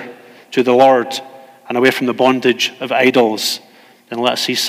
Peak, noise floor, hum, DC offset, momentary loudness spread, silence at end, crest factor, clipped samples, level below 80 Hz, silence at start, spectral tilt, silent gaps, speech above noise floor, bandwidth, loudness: 0 dBFS; -37 dBFS; none; under 0.1%; 13 LU; 0 s; 16 dB; under 0.1%; -68 dBFS; 0 s; -3.5 dB/octave; none; 23 dB; 16 kHz; -14 LUFS